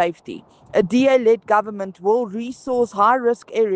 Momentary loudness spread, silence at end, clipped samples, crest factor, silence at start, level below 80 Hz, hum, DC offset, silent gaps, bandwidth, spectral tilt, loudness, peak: 14 LU; 0 s; under 0.1%; 16 dB; 0 s; -62 dBFS; none; under 0.1%; none; 9 kHz; -6 dB/octave; -19 LUFS; -4 dBFS